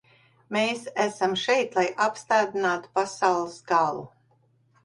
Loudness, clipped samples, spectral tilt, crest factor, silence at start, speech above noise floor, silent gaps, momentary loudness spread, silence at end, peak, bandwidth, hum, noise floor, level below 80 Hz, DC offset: -25 LUFS; under 0.1%; -3.5 dB/octave; 18 dB; 0.5 s; 39 dB; none; 5 LU; 0.75 s; -8 dBFS; 11.5 kHz; none; -64 dBFS; -70 dBFS; under 0.1%